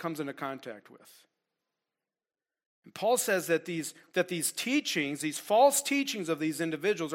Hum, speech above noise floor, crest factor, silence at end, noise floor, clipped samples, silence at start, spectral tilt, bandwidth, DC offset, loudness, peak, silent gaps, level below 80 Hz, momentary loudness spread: none; over 60 dB; 20 dB; 0 s; under -90 dBFS; under 0.1%; 0 s; -3 dB/octave; 16.5 kHz; under 0.1%; -29 LUFS; -12 dBFS; 2.66-2.82 s; -84 dBFS; 14 LU